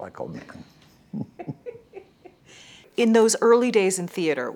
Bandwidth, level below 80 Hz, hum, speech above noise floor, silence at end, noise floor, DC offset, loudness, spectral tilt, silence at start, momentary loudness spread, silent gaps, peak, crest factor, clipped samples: 16.5 kHz; -68 dBFS; none; 30 dB; 0 s; -51 dBFS; under 0.1%; -20 LUFS; -4 dB/octave; 0 s; 22 LU; none; -6 dBFS; 20 dB; under 0.1%